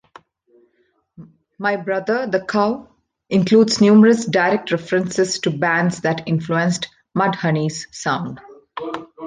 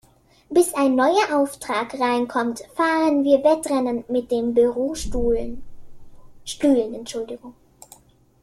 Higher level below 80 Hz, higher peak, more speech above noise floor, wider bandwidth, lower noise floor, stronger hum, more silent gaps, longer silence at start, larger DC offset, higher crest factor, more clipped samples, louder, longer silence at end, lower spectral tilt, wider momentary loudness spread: second, -60 dBFS vs -42 dBFS; about the same, -2 dBFS vs -4 dBFS; first, 47 dB vs 31 dB; second, 9.6 kHz vs 15.5 kHz; first, -64 dBFS vs -52 dBFS; neither; neither; first, 1.2 s vs 0.5 s; neither; about the same, 16 dB vs 16 dB; neither; first, -18 LUFS vs -21 LUFS; second, 0 s vs 0.9 s; first, -5.5 dB/octave vs -4 dB/octave; about the same, 15 LU vs 13 LU